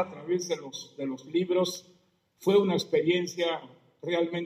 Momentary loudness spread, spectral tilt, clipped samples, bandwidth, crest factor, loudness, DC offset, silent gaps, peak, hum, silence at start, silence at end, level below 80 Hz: 12 LU; -5 dB/octave; under 0.1%; 15.5 kHz; 16 dB; -29 LUFS; under 0.1%; none; -12 dBFS; none; 0 s; 0 s; -80 dBFS